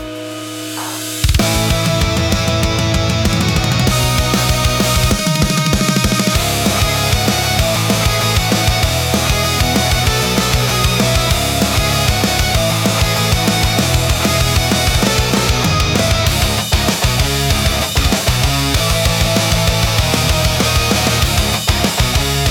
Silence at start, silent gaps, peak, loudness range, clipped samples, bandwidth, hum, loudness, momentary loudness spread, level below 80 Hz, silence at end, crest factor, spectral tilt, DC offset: 0 s; none; -2 dBFS; 1 LU; under 0.1%; 18 kHz; none; -14 LUFS; 2 LU; -22 dBFS; 0 s; 12 dB; -4 dB/octave; under 0.1%